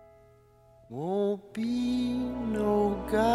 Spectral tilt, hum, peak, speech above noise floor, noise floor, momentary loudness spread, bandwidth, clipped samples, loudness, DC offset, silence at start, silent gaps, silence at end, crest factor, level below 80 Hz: -6.5 dB/octave; none; -14 dBFS; 29 dB; -59 dBFS; 6 LU; 13.5 kHz; under 0.1%; -30 LUFS; under 0.1%; 0.9 s; none; 0 s; 16 dB; -50 dBFS